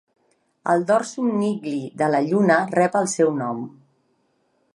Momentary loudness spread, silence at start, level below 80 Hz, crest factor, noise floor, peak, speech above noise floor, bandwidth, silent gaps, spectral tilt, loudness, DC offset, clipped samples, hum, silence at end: 11 LU; 0.65 s; -72 dBFS; 18 dB; -67 dBFS; -4 dBFS; 46 dB; 11.5 kHz; none; -5.5 dB/octave; -21 LUFS; under 0.1%; under 0.1%; none; 1.05 s